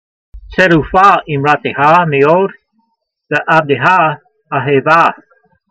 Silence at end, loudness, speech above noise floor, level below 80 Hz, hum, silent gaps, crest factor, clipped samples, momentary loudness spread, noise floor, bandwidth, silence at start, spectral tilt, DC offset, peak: 0.55 s; -11 LUFS; 54 dB; -40 dBFS; none; none; 12 dB; 0.2%; 10 LU; -64 dBFS; 8.6 kHz; 0.35 s; -6.5 dB/octave; under 0.1%; 0 dBFS